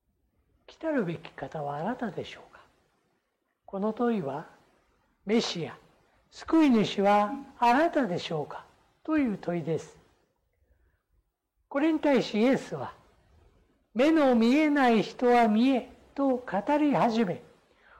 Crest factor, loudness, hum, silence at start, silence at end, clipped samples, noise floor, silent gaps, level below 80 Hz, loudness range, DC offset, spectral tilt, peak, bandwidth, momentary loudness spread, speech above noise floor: 12 dB; -27 LUFS; none; 0.7 s; 0.6 s; under 0.1%; -77 dBFS; none; -64 dBFS; 11 LU; under 0.1%; -6 dB/octave; -16 dBFS; 12 kHz; 17 LU; 51 dB